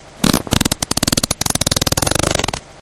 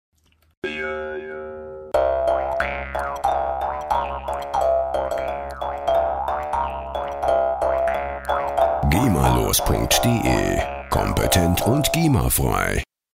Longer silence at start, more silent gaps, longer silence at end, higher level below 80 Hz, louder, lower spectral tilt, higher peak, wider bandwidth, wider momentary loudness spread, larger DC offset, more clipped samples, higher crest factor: second, 0.05 s vs 0.65 s; neither; second, 0.1 s vs 0.35 s; about the same, -32 dBFS vs -32 dBFS; first, -16 LUFS vs -21 LUFS; second, -3 dB/octave vs -4.5 dB/octave; about the same, 0 dBFS vs -2 dBFS; first, over 20 kHz vs 16 kHz; second, 2 LU vs 10 LU; neither; first, 0.1% vs under 0.1%; about the same, 18 dB vs 20 dB